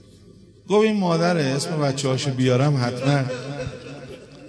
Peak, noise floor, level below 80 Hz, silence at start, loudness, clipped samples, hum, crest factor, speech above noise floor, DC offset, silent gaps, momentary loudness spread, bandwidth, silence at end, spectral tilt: -6 dBFS; -48 dBFS; -54 dBFS; 0.7 s; -21 LUFS; under 0.1%; none; 16 dB; 28 dB; under 0.1%; none; 16 LU; 11 kHz; 0 s; -6 dB/octave